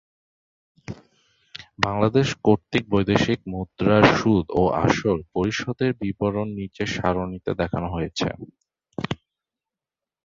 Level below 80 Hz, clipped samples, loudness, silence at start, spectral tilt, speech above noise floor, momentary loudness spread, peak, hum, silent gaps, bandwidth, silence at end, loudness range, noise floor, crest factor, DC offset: -46 dBFS; under 0.1%; -23 LUFS; 0.9 s; -6 dB/octave; 68 dB; 18 LU; -2 dBFS; none; none; 7.6 kHz; 1.1 s; 8 LU; -89 dBFS; 22 dB; under 0.1%